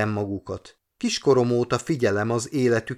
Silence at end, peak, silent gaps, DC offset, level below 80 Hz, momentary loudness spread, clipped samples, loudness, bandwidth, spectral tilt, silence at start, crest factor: 0 s; -8 dBFS; none; under 0.1%; -54 dBFS; 11 LU; under 0.1%; -23 LUFS; 14 kHz; -5.5 dB/octave; 0 s; 16 dB